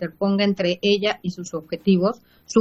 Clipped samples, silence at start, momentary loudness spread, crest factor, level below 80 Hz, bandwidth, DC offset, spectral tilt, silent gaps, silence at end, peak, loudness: under 0.1%; 0 s; 10 LU; 18 dB; -60 dBFS; 8 kHz; under 0.1%; -6 dB/octave; none; 0 s; -4 dBFS; -22 LUFS